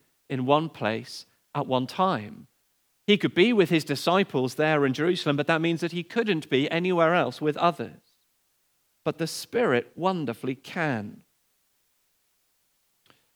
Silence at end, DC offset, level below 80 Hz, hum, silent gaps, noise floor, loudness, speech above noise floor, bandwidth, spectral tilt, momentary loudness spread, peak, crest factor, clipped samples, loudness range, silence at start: 2.2 s; under 0.1%; -80 dBFS; none; none; -70 dBFS; -25 LUFS; 45 dB; over 20 kHz; -5.5 dB/octave; 12 LU; -6 dBFS; 20 dB; under 0.1%; 6 LU; 0.3 s